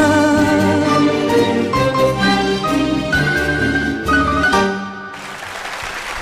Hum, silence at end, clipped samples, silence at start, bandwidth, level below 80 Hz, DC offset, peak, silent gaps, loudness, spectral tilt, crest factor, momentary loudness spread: none; 0 s; under 0.1%; 0 s; 15 kHz; -34 dBFS; under 0.1%; -4 dBFS; none; -15 LUFS; -5 dB/octave; 12 dB; 12 LU